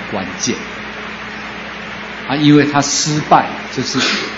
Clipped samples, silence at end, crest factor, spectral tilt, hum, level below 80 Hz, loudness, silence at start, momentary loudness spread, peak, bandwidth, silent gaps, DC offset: under 0.1%; 0 s; 16 dB; -4 dB/octave; none; -48 dBFS; -16 LUFS; 0 s; 15 LU; 0 dBFS; 8 kHz; none; under 0.1%